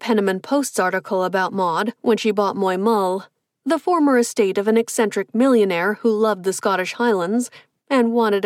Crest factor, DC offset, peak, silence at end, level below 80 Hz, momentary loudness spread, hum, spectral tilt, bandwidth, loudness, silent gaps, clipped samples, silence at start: 14 dB; under 0.1%; -6 dBFS; 0 s; -74 dBFS; 5 LU; none; -4.5 dB/octave; 16 kHz; -19 LUFS; none; under 0.1%; 0 s